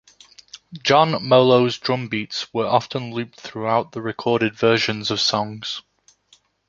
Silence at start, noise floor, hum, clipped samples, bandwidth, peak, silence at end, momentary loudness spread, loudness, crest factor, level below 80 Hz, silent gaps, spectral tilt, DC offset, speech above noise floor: 0.55 s; -58 dBFS; none; under 0.1%; 7.6 kHz; -2 dBFS; 0.9 s; 13 LU; -20 LUFS; 20 dB; -62 dBFS; none; -5 dB/octave; under 0.1%; 39 dB